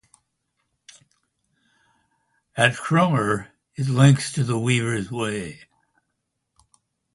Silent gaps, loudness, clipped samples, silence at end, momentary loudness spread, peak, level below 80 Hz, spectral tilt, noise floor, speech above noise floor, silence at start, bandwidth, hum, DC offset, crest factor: none; -21 LUFS; under 0.1%; 1.6 s; 14 LU; 0 dBFS; -58 dBFS; -5.5 dB/octave; -77 dBFS; 57 dB; 2.55 s; 11.5 kHz; none; under 0.1%; 24 dB